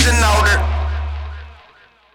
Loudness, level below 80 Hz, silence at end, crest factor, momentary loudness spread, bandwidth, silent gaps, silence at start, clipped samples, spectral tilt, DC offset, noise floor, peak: -16 LUFS; -20 dBFS; 0.6 s; 16 dB; 18 LU; 16 kHz; none; 0 s; under 0.1%; -3.5 dB/octave; under 0.1%; -49 dBFS; -2 dBFS